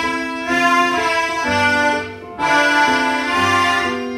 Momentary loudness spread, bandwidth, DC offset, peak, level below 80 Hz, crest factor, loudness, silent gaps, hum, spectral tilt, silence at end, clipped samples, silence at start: 7 LU; 16 kHz; under 0.1%; -2 dBFS; -50 dBFS; 14 dB; -16 LUFS; none; none; -3 dB/octave; 0 s; under 0.1%; 0 s